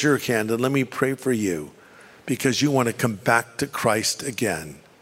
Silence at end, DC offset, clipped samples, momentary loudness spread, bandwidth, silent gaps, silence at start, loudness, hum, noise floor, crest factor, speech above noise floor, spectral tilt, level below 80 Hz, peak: 0.25 s; under 0.1%; under 0.1%; 10 LU; 16 kHz; none; 0 s; -23 LUFS; none; -49 dBFS; 22 dB; 26 dB; -4.5 dB/octave; -60 dBFS; -2 dBFS